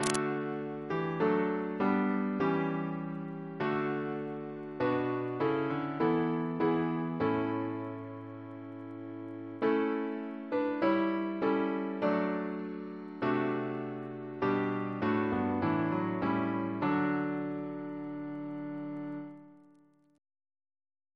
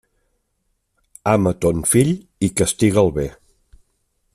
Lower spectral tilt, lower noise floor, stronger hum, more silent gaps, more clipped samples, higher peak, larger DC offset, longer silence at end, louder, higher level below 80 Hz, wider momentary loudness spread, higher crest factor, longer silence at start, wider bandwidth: about the same, -6.5 dB/octave vs -5.5 dB/octave; second, -64 dBFS vs -70 dBFS; neither; neither; neither; second, -8 dBFS vs -2 dBFS; neither; first, 1.55 s vs 1.05 s; second, -33 LUFS vs -18 LUFS; second, -68 dBFS vs -44 dBFS; first, 12 LU vs 9 LU; first, 26 dB vs 20 dB; second, 0 s vs 1.25 s; second, 11 kHz vs 15.5 kHz